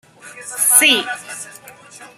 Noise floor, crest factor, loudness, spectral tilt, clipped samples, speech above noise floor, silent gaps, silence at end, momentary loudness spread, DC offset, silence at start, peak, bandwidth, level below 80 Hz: -40 dBFS; 20 dB; -12 LUFS; 1 dB/octave; under 0.1%; 21 dB; none; 0.1 s; 23 LU; under 0.1%; 0.25 s; 0 dBFS; 16 kHz; -72 dBFS